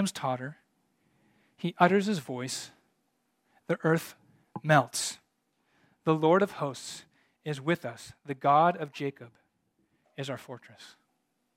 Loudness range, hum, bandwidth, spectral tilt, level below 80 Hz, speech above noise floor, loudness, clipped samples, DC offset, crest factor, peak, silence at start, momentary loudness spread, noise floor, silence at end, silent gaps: 3 LU; none; 16.5 kHz; -5 dB/octave; -78 dBFS; 48 dB; -29 LUFS; under 0.1%; under 0.1%; 26 dB; -6 dBFS; 0 s; 22 LU; -77 dBFS; 0.7 s; none